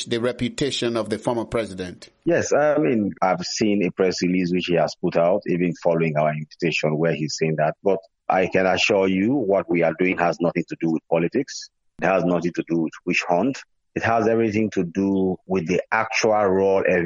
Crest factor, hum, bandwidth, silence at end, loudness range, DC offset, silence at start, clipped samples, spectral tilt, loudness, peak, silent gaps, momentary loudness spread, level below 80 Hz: 18 dB; none; 11.5 kHz; 0 s; 2 LU; under 0.1%; 0 s; under 0.1%; -5.5 dB/octave; -22 LUFS; -4 dBFS; none; 7 LU; -56 dBFS